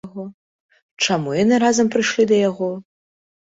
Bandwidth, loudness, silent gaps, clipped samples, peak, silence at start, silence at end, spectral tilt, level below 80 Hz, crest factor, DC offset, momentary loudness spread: 8 kHz; -18 LUFS; 0.34-0.69 s, 0.82-0.97 s; under 0.1%; -4 dBFS; 0.05 s; 0.7 s; -4 dB/octave; -60 dBFS; 16 dB; under 0.1%; 18 LU